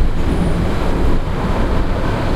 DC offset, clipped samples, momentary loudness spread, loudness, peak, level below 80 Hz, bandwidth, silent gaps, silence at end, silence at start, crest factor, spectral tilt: under 0.1%; under 0.1%; 2 LU; -19 LUFS; -2 dBFS; -16 dBFS; 11 kHz; none; 0 s; 0 s; 12 dB; -7 dB/octave